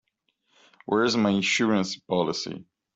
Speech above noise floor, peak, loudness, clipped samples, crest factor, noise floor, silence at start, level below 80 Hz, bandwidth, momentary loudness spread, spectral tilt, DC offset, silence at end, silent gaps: 49 dB; -10 dBFS; -24 LUFS; under 0.1%; 16 dB; -74 dBFS; 0.9 s; -66 dBFS; 8.2 kHz; 14 LU; -4.5 dB/octave; under 0.1%; 0.35 s; none